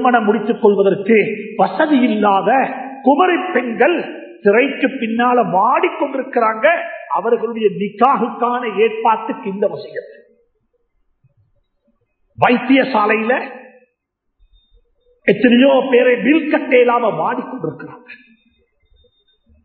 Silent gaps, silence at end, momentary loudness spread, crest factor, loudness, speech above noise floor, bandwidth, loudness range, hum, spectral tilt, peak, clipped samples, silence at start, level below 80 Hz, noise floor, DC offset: none; 1.5 s; 9 LU; 16 dB; -15 LUFS; 58 dB; 4.5 kHz; 6 LU; none; -9 dB/octave; 0 dBFS; under 0.1%; 0 s; -64 dBFS; -72 dBFS; under 0.1%